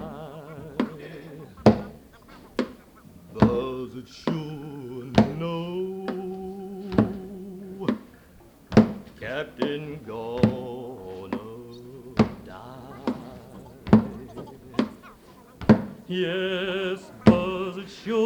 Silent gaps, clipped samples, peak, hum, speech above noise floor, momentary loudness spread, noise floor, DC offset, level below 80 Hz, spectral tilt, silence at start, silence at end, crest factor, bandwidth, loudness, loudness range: none; under 0.1%; -2 dBFS; none; 23 dB; 20 LU; -52 dBFS; under 0.1%; -50 dBFS; -7.5 dB/octave; 0 s; 0 s; 24 dB; 9.6 kHz; -26 LUFS; 5 LU